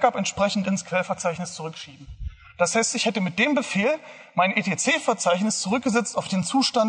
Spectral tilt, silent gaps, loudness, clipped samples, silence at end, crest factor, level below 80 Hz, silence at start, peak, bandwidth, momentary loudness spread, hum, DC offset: -3.5 dB/octave; none; -23 LUFS; under 0.1%; 0 s; 18 dB; -48 dBFS; 0 s; -4 dBFS; 10.5 kHz; 13 LU; none; under 0.1%